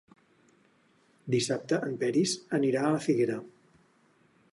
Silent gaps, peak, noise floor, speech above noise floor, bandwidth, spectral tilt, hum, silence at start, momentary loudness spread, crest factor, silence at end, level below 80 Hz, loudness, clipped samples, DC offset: none; -14 dBFS; -66 dBFS; 38 dB; 11.5 kHz; -5 dB/octave; none; 1.25 s; 4 LU; 18 dB; 1.05 s; -74 dBFS; -29 LUFS; under 0.1%; under 0.1%